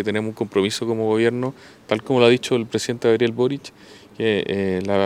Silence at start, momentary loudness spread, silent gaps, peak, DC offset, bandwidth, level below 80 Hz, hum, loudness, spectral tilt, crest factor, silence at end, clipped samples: 0 s; 10 LU; none; 0 dBFS; under 0.1%; 14 kHz; -62 dBFS; none; -21 LUFS; -5.5 dB/octave; 20 dB; 0 s; under 0.1%